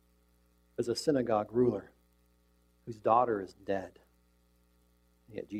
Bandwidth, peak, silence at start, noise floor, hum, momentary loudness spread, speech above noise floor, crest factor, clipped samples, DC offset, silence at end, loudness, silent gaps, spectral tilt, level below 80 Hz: 14.5 kHz; -12 dBFS; 0.8 s; -69 dBFS; 60 Hz at -60 dBFS; 20 LU; 37 dB; 22 dB; under 0.1%; under 0.1%; 0 s; -32 LUFS; none; -6 dB/octave; -66 dBFS